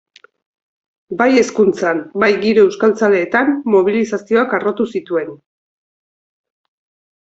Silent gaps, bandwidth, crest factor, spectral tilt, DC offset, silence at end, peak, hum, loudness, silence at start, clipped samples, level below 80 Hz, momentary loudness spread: none; 8 kHz; 16 dB; -5.5 dB/octave; under 0.1%; 1.85 s; 0 dBFS; none; -15 LUFS; 1.1 s; under 0.1%; -60 dBFS; 8 LU